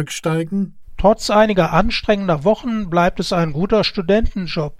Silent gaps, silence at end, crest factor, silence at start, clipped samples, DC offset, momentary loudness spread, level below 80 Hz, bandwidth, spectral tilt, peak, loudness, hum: none; 0.05 s; 16 dB; 0 s; under 0.1%; under 0.1%; 8 LU; -30 dBFS; 15.5 kHz; -5.5 dB/octave; -2 dBFS; -17 LUFS; none